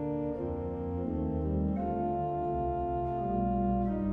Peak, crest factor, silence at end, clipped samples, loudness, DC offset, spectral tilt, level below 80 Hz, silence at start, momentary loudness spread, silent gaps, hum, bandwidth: -20 dBFS; 12 dB; 0 s; under 0.1%; -32 LUFS; under 0.1%; -12 dB/octave; -42 dBFS; 0 s; 5 LU; none; none; 3.7 kHz